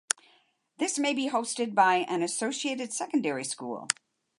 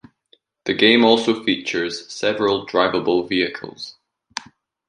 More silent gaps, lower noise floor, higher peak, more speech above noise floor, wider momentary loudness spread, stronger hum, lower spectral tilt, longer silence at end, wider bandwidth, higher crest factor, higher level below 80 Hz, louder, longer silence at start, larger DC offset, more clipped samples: neither; first, -66 dBFS vs -60 dBFS; about the same, -4 dBFS vs -2 dBFS; about the same, 38 dB vs 41 dB; second, 9 LU vs 19 LU; neither; second, -2 dB/octave vs -4 dB/octave; about the same, 0.45 s vs 0.5 s; about the same, 11.5 kHz vs 10.5 kHz; first, 26 dB vs 20 dB; second, -84 dBFS vs -60 dBFS; second, -29 LUFS vs -18 LUFS; first, 0.8 s vs 0.65 s; neither; neither